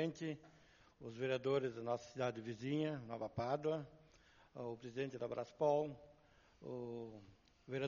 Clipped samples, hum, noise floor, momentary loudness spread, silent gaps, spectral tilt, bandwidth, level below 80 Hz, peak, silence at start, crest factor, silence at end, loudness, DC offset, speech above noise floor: under 0.1%; none; -69 dBFS; 16 LU; none; -5.5 dB/octave; 7 kHz; -76 dBFS; -24 dBFS; 0 s; 20 dB; 0 s; -43 LUFS; under 0.1%; 27 dB